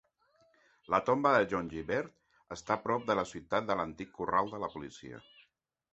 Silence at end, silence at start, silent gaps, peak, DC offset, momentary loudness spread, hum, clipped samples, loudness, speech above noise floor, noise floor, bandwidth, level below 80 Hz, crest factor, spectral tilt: 0.75 s; 0.9 s; none; -12 dBFS; under 0.1%; 19 LU; none; under 0.1%; -32 LUFS; 40 dB; -73 dBFS; 8 kHz; -64 dBFS; 22 dB; -4 dB/octave